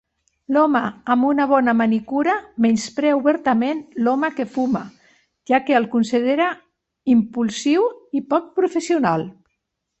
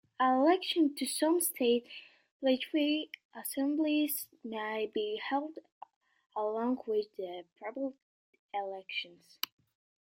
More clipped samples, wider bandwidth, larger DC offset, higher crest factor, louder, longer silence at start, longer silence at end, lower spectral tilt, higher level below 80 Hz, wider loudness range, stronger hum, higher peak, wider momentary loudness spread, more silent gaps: neither; second, 8.4 kHz vs 16.5 kHz; neither; about the same, 16 dB vs 20 dB; first, -19 LUFS vs -33 LUFS; first, 0.5 s vs 0.2 s; second, 0.7 s vs 0.95 s; first, -5.5 dB/octave vs -2 dB/octave; first, -62 dBFS vs -84 dBFS; second, 2 LU vs 7 LU; neither; first, -4 dBFS vs -12 dBFS; second, 6 LU vs 15 LU; second, none vs 2.31-2.40 s, 3.25-3.30 s, 5.72-5.81 s, 5.96-6.01 s, 6.26-6.30 s, 8.02-8.33 s, 8.39-8.49 s